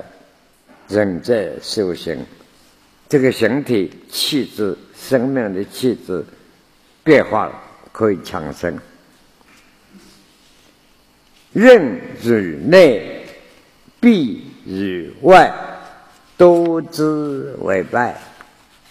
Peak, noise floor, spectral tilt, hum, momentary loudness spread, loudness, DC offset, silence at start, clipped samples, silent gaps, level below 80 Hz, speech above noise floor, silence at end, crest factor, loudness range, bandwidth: 0 dBFS; -53 dBFS; -5.5 dB/octave; none; 19 LU; -16 LUFS; under 0.1%; 0.9 s; 0.1%; none; -52 dBFS; 38 dB; 0.65 s; 18 dB; 9 LU; 15 kHz